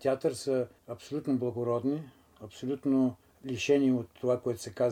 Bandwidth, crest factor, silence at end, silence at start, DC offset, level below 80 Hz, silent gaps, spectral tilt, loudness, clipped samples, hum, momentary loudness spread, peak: 14.5 kHz; 16 dB; 0 s; 0 s; under 0.1%; -70 dBFS; none; -6 dB/octave; -31 LUFS; under 0.1%; none; 16 LU; -14 dBFS